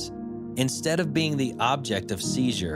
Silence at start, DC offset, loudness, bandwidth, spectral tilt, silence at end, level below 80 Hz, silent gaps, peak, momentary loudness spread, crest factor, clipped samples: 0 s; under 0.1%; -26 LUFS; 16 kHz; -4.5 dB/octave; 0 s; -56 dBFS; none; -6 dBFS; 8 LU; 20 dB; under 0.1%